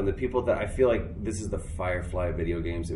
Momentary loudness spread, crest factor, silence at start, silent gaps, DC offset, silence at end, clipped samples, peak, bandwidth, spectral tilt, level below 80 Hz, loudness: 9 LU; 18 dB; 0 s; none; under 0.1%; 0 s; under 0.1%; -10 dBFS; 11.5 kHz; -7 dB/octave; -38 dBFS; -29 LUFS